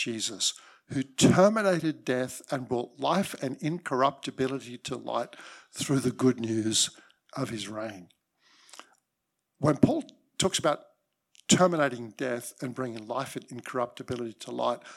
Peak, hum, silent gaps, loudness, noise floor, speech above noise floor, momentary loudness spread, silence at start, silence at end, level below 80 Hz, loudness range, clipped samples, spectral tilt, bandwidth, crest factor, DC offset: -4 dBFS; none; none; -28 LUFS; -82 dBFS; 54 dB; 14 LU; 0 s; 0 s; -66 dBFS; 5 LU; under 0.1%; -4 dB/octave; 16 kHz; 26 dB; under 0.1%